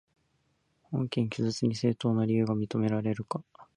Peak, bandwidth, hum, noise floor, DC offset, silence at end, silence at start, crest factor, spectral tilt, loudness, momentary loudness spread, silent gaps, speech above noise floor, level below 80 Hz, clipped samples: -14 dBFS; 10.5 kHz; none; -73 dBFS; under 0.1%; 0.15 s; 0.9 s; 16 dB; -7 dB/octave; -30 LUFS; 8 LU; none; 44 dB; -66 dBFS; under 0.1%